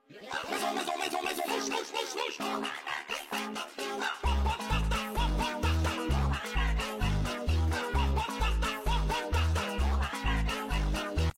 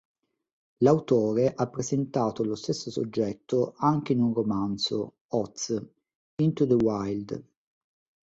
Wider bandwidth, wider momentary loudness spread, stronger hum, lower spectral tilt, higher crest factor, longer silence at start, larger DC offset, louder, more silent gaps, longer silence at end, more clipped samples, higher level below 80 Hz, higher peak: first, 16.5 kHz vs 8 kHz; second, 5 LU vs 9 LU; neither; second, -4.5 dB/octave vs -6.5 dB/octave; second, 14 dB vs 20 dB; second, 0.1 s vs 0.8 s; neither; second, -32 LUFS vs -27 LUFS; second, none vs 5.21-5.29 s, 6.15-6.38 s; second, 0.05 s vs 0.85 s; neither; first, -34 dBFS vs -62 dBFS; second, -16 dBFS vs -8 dBFS